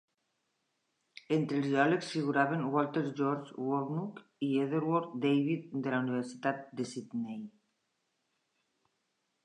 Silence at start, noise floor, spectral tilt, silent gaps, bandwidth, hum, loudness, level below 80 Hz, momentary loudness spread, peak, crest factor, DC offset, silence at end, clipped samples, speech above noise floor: 1.3 s; -81 dBFS; -7 dB/octave; none; 10.5 kHz; none; -33 LUFS; -86 dBFS; 10 LU; -12 dBFS; 22 dB; under 0.1%; 1.95 s; under 0.1%; 49 dB